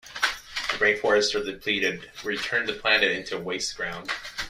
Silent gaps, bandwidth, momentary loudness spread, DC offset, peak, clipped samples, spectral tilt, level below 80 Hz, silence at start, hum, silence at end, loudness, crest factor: none; 15.5 kHz; 11 LU; under 0.1%; -6 dBFS; under 0.1%; -2 dB/octave; -56 dBFS; 0.05 s; none; 0 s; -25 LUFS; 20 dB